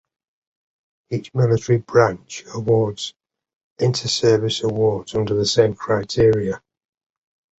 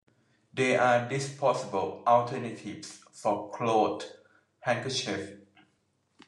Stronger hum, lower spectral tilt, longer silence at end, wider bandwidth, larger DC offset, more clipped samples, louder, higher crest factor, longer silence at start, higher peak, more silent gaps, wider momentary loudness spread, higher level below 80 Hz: neither; about the same, -5.5 dB/octave vs -4.5 dB/octave; about the same, 1 s vs 0.9 s; second, 8.2 kHz vs 11 kHz; neither; neither; first, -19 LUFS vs -29 LUFS; about the same, 18 dB vs 20 dB; first, 1.1 s vs 0.55 s; first, -2 dBFS vs -10 dBFS; first, 3.55-3.76 s vs none; second, 12 LU vs 16 LU; first, -48 dBFS vs -78 dBFS